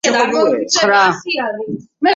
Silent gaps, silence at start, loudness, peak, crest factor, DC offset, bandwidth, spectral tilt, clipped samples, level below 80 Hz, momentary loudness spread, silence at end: none; 0.05 s; -14 LUFS; -2 dBFS; 14 dB; under 0.1%; 11 kHz; -2.5 dB/octave; under 0.1%; -62 dBFS; 11 LU; 0 s